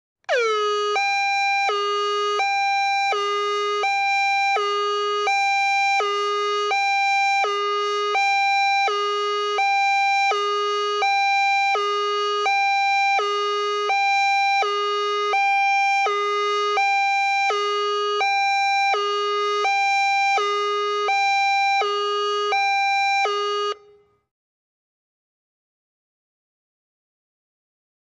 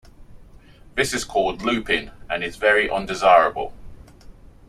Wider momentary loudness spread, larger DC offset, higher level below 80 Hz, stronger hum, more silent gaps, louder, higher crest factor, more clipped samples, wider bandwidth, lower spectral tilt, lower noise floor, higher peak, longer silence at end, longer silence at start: second, 4 LU vs 14 LU; neither; second, -80 dBFS vs -44 dBFS; neither; neither; about the same, -20 LUFS vs -20 LUFS; second, 12 dB vs 20 dB; neither; second, 10.5 kHz vs 14.5 kHz; second, 1 dB/octave vs -3.5 dB/octave; first, -55 dBFS vs -46 dBFS; second, -10 dBFS vs -2 dBFS; first, 4.4 s vs 0.4 s; about the same, 0.3 s vs 0.2 s